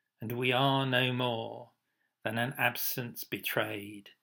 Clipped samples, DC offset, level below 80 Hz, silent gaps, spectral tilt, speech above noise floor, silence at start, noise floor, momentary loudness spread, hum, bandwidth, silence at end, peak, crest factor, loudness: under 0.1%; under 0.1%; -82 dBFS; none; -4.5 dB/octave; 48 dB; 0.2 s; -80 dBFS; 13 LU; none; 18 kHz; 0.15 s; -12 dBFS; 22 dB; -31 LUFS